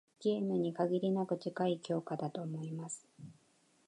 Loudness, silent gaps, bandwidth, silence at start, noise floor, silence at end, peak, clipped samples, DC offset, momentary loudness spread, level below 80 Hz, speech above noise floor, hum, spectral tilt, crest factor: -37 LUFS; none; 11 kHz; 0.2 s; -71 dBFS; 0.55 s; -20 dBFS; under 0.1%; under 0.1%; 12 LU; -84 dBFS; 35 dB; none; -6.5 dB/octave; 16 dB